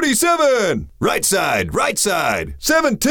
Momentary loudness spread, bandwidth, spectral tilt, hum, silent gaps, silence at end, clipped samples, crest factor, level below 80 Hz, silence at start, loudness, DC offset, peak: 6 LU; 19.5 kHz; -3 dB/octave; none; none; 0 s; under 0.1%; 12 dB; -40 dBFS; 0 s; -17 LUFS; under 0.1%; -6 dBFS